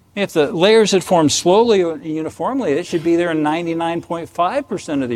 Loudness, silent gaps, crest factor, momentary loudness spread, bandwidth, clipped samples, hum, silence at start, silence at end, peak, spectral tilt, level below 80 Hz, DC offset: -17 LUFS; none; 16 dB; 10 LU; 14.5 kHz; under 0.1%; none; 0.15 s; 0 s; 0 dBFS; -4.5 dB/octave; -56 dBFS; under 0.1%